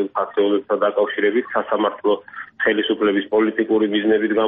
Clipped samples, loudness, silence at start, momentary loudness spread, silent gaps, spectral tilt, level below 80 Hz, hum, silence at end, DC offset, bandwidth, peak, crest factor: under 0.1%; -19 LUFS; 0 s; 4 LU; none; -2.5 dB/octave; -64 dBFS; none; 0 s; under 0.1%; 3.8 kHz; -4 dBFS; 16 dB